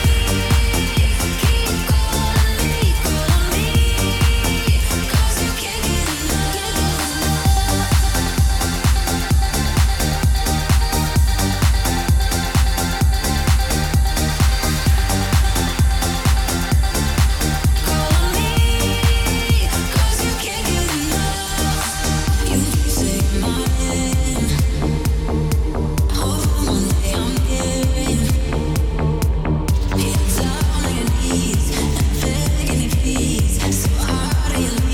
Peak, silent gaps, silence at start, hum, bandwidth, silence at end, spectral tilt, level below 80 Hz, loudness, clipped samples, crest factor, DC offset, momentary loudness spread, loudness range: -4 dBFS; none; 0 s; none; 18 kHz; 0 s; -4.5 dB/octave; -20 dBFS; -18 LUFS; under 0.1%; 12 dB; under 0.1%; 3 LU; 2 LU